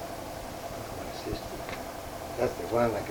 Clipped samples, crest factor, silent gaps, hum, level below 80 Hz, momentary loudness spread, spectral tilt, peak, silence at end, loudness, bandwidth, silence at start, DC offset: under 0.1%; 20 dB; none; none; -50 dBFS; 11 LU; -5 dB/octave; -14 dBFS; 0 s; -34 LUFS; over 20 kHz; 0 s; under 0.1%